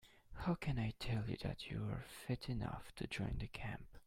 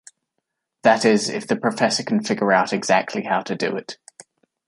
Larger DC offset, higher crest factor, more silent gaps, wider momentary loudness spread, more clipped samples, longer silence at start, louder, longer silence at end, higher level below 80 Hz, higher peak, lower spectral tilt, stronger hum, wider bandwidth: neither; about the same, 18 dB vs 20 dB; neither; about the same, 7 LU vs 8 LU; neither; second, 0.05 s vs 0.85 s; second, -44 LUFS vs -20 LUFS; second, 0.05 s vs 0.75 s; first, -54 dBFS vs -68 dBFS; second, -26 dBFS vs -2 dBFS; first, -6.5 dB/octave vs -4 dB/octave; neither; first, 16 kHz vs 11.5 kHz